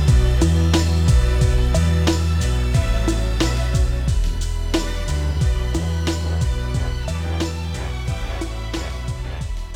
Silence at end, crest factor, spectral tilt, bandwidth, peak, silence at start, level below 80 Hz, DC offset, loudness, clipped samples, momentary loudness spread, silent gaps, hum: 0 s; 16 dB; -5.5 dB/octave; 15 kHz; -2 dBFS; 0 s; -22 dBFS; under 0.1%; -21 LUFS; under 0.1%; 10 LU; none; none